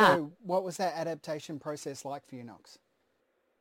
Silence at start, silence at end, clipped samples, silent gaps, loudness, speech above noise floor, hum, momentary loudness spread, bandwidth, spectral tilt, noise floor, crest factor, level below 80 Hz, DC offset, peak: 0 s; 1.05 s; under 0.1%; none; -34 LUFS; 41 dB; none; 16 LU; 16.5 kHz; -4.5 dB/octave; -75 dBFS; 22 dB; -78 dBFS; under 0.1%; -10 dBFS